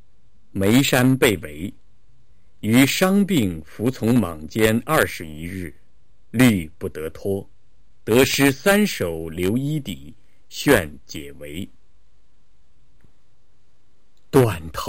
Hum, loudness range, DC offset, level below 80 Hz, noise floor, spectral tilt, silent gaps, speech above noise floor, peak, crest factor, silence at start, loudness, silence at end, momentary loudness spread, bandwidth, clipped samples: none; 7 LU; 1%; -46 dBFS; -64 dBFS; -5 dB/octave; none; 44 dB; 0 dBFS; 22 dB; 0.55 s; -20 LUFS; 0 s; 18 LU; 16.5 kHz; under 0.1%